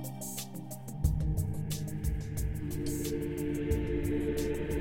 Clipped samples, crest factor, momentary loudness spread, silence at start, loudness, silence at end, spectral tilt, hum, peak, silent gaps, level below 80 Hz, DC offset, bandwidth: under 0.1%; 16 dB; 6 LU; 0 s; -35 LUFS; 0 s; -6 dB/octave; none; -16 dBFS; none; -38 dBFS; 0.2%; 16.5 kHz